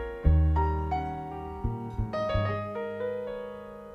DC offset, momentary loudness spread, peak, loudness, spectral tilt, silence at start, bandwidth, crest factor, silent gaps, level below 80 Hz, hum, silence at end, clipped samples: under 0.1%; 13 LU; -10 dBFS; -30 LUFS; -9 dB/octave; 0 s; 5.4 kHz; 18 dB; none; -32 dBFS; none; 0 s; under 0.1%